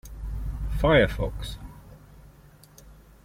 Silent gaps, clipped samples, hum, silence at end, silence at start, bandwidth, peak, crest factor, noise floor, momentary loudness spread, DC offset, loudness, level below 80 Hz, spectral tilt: none; under 0.1%; none; 0.3 s; 0.05 s; 16.5 kHz; -8 dBFS; 22 dB; -52 dBFS; 20 LU; under 0.1%; -26 LUFS; -34 dBFS; -6.5 dB/octave